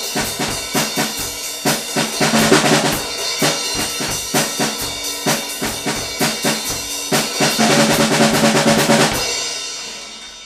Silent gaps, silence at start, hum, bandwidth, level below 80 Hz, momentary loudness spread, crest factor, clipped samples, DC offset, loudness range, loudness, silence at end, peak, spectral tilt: none; 0 s; none; 16 kHz; -44 dBFS; 8 LU; 18 dB; under 0.1%; under 0.1%; 4 LU; -16 LUFS; 0 s; 0 dBFS; -2.5 dB/octave